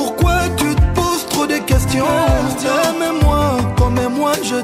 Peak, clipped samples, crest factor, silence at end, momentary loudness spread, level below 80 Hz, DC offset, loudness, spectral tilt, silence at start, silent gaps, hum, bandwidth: -4 dBFS; under 0.1%; 12 dB; 0 s; 3 LU; -22 dBFS; under 0.1%; -16 LUFS; -5 dB/octave; 0 s; none; none; 16 kHz